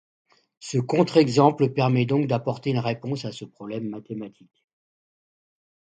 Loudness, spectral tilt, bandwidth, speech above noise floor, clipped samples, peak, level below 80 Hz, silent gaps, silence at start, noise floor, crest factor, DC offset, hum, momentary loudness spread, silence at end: -23 LUFS; -7 dB/octave; 9.2 kHz; over 67 dB; under 0.1%; -4 dBFS; -66 dBFS; none; 0.6 s; under -90 dBFS; 22 dB; under 0.1%; none; 17 LU; 1.55 s